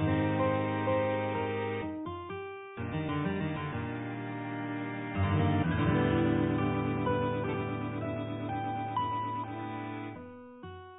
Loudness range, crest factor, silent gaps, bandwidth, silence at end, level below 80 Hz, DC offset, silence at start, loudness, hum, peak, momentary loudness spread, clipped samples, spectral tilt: 6 LU; 16 dB; none; 4 kHz; 0 s; -50 dBFS; under 0.1%; 0 s; -33 LUFS; none; -16 dBFS; 12 LU; under 0.1%; -11 dB/octave